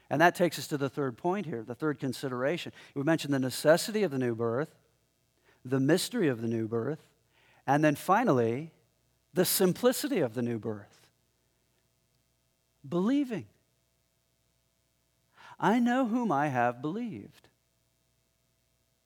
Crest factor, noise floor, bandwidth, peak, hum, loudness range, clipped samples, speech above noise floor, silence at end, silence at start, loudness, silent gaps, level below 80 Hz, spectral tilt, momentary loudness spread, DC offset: 24 dB; -74 dBFS; 18.5 kHz; -8 dBFS; none; 8 LU; under 0.1%; 45 dB; 1.8 s; 0.1 s; -30 LUFS; none; -78 dBFS; -5 dB/octave; 12 LU; under 0.1%